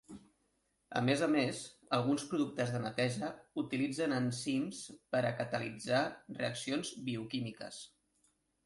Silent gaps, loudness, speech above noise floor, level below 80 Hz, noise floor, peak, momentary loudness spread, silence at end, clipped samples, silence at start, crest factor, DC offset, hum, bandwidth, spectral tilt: none; -36 LUFS; 43 dB; -72 dBFS; -78 dBFS; -18 dBFS; 12 LU; 0.8 s; under 0.1%; 0.1 s; 20 dB; under 0.1%; none; 11.5 kHz; -5 dB/octave